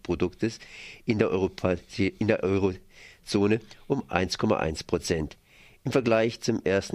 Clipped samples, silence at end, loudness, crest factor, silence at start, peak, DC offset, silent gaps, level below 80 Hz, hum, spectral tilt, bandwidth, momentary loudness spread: under 0.1%; 0 s; -27 LUFS; 22 dB; 0.1 s; -6 dBFS; under 0.1%; none; -50 dBFS; none; -6 dB/octave; 15.5 kHz; 10 LU